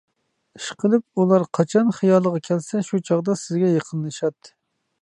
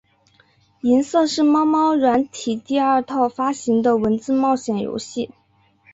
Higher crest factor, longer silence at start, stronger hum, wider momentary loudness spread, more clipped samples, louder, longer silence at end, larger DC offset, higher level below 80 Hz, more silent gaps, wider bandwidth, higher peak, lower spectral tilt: about the same, 18 dB vs 14 dB; second, 0.6 s vs 0.85 s; neither; about the same, 9 LU vs 10 LU; neither; about the same, -21 LUFS vs -19 LUFS; about the same, 0.55 s vs 0.65 s; neither; second, -70 dBFS vs -58 dBFS; neither; first, 11 kHz vs 8 kHz; about the same, -4 dBFS vs -6 dBFS; first, -7 dB/octave vs -5 dB/octave